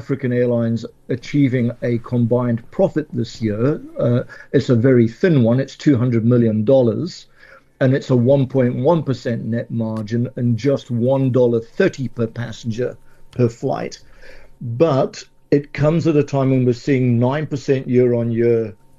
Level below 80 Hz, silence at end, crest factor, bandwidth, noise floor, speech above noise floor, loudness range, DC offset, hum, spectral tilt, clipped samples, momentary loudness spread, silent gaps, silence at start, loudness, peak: -48 dBFS; 0.25 s; 16 dB; 7.6 kHz; -47 dBFS; 30 dB; 5 LU; under 0.1%; none; -8.5 dB/octave; under 0.1%; 9 LU; none; 0 s; -18 LUFS; -2 dBFS